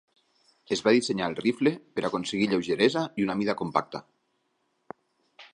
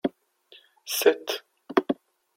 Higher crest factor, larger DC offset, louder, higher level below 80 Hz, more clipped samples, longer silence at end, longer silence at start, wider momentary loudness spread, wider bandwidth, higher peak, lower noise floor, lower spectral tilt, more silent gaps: about the same, 22 dB vs 24 dB; neither; about the same, -27 LUFS vs -27 LUFS; first, -66 dBFS vs -72 dBFS; neither; second, 0.1 s vs 0.45 s; first, 0.7 s vs 0.05 s; second, 8 LU vs 11 LU; second, 11 kHz vs 16.5 kHz; about the same, -6 dBFS vs -4 dBFS; first, -74 dBFS vs -57 dBFS; first, -5 dB/octave vs -2.5 dB/octave; neither